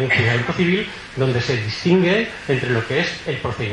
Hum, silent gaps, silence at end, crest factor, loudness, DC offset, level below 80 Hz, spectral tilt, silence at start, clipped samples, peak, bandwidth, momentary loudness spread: none; none; 0 s; 16 dB; -19 LUFS; under 0.1%; -48 dBFS; -6 dB/octave; 0 s; under 0.1%; -4 dBFS; 10.5 kHz; 7 LU